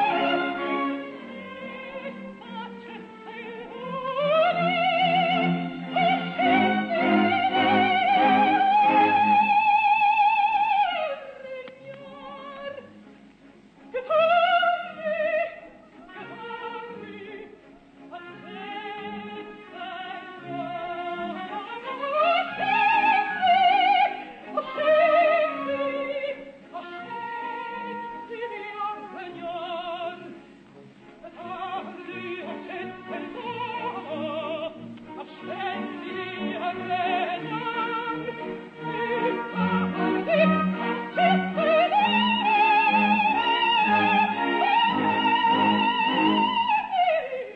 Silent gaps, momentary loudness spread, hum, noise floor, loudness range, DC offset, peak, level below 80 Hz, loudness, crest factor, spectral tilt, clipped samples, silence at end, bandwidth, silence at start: none; 19 LU; none; -52 dBFS; 15 LU; under 0.1%; -8 dBFS; -68 dBFS; -23 LUFS; 16 dB; -7 dB/octave; under 0.1%; 0 s; 7 kHz; 0 s